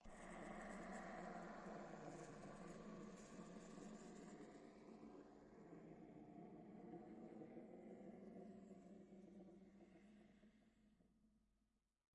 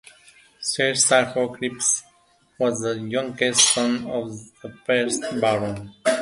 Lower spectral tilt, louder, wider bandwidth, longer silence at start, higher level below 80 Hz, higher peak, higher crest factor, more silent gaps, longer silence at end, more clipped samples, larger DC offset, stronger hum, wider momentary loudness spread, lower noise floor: first, -6 dB/octave vs -2 dB/octave; second, -60 LUFS vs -21 LUFS; about the same, 11 kHz vs 11.5 kHz; second, 0 s vs 0.6 s; second, -76 dBFS vs -60 dBFS; second, -42 dBFS vs -2 dBFS; about the same, 18 dB vs 22 dB; neither; first, 0.7 s vs 0 s; neither; neither; neither; second, 9 LU vs 13 LU; first, -88 dBFS vs -60 dBFS